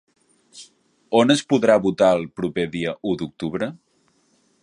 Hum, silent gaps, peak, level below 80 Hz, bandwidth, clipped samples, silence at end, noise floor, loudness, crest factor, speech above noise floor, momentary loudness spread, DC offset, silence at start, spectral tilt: none; none; -2 dBFS; -58 dBFS; 11 kHz; under 0.1%; 0.85 s; -63 dBFS; -21 LUFS; 20 dB; 44 dB; 10 LU; under 0.1%; 0.55 s; -5.5 dB/octave